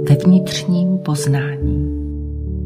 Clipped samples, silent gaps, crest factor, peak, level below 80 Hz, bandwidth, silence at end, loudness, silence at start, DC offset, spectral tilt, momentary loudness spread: under 0.1%; none; 16 dB; -2 dBFS; -28 dBFS; 15 kHz; 0 s; -17 LUFS; 0 s; under 0.1%; -6.5 dB/octave; 13 LU